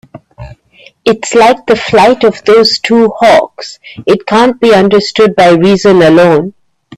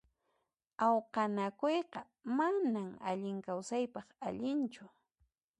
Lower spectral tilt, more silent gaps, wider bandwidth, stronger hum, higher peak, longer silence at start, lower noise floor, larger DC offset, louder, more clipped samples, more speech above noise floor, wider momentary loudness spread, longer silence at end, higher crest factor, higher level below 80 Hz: about the same, -5 dB/octave vs -6 dB/octave; neither; first, 13 kHz vs 11 kHz; neither; first, 0 dBFS vs -18 dBFS; second, 0.15 s vs 0.8 s; second, -41 dBFS vs -83 dBFS; first, 0.3% vs under 0.1%; first, -7 LUFS vs -36 LUFS; first, 0.2% vs under 0.1%; second, 35 dB vs 47 dB; second, 8 LU vs 11 LU; second, 0.45 s vs 0.7 s; second, 8 dB vs 18 dB; first, -42 dBFS vs -80 dBFS